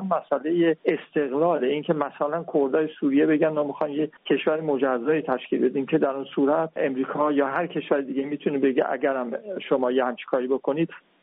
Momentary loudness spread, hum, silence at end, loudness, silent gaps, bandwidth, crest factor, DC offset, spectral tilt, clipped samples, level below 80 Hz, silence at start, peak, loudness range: 5 LU; none; 0.25 s; -24 LUFS; none; 4 kHz; 16 dB; under 0.1%; -5 dB/octave; under 0.1%; -72 dBFS; 0 s; -8 dBFS; 2 LU